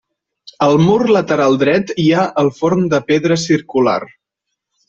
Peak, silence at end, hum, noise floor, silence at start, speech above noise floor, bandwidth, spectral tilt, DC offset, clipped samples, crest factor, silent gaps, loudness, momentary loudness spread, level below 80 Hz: -2 dBFS; 0.8 s; none; -77 dBFS; 0.45 s; 64 dB; 7.8 kHz; -6 dB/octave; under 0.1%; under 0.1%; 12 dB; none; -14 LUFS; 4 LU; -52 dBFS